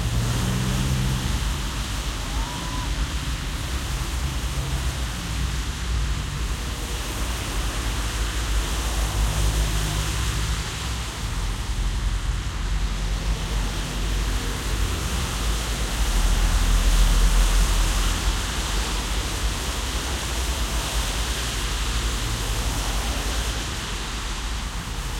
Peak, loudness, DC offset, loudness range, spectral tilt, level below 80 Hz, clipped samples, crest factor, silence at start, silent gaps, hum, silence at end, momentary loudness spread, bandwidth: -8 dBFS; -26 LUFS; under 0.1%; 5 LU; -3.5 dB/octave; -26 dBFS; under 0.1%; 16 dB; 0 s; none; none; 0 s; 6 LU; 16.5 kHz